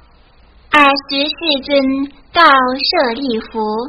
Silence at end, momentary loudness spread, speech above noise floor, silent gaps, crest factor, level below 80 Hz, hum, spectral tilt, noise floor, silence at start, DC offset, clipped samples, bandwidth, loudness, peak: 0 s; 11 LU; 32 dB; none; 14 dB; -46 dBFS; none; -4.5 dB/octave; -46 dBFS; 0.7 s; under 0.1%; 0.1%; 11 kHz; -13 LUFS; 0 dBFS